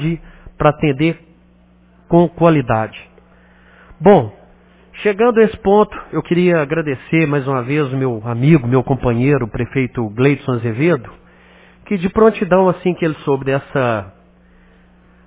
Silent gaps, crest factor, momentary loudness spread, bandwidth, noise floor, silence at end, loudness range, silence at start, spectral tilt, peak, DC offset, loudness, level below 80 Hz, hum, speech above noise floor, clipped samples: none; 16 dB; 8 LU; 4 kHz; -49 dBFS; 1.15 s; 2 LU; 0 s; -11.5 dB/octave; 0 dBFS; under 0.1%; -16 LUFS; -42 dBFS; 60 Hz at -40 dBFS; 35 dB; under 0.1%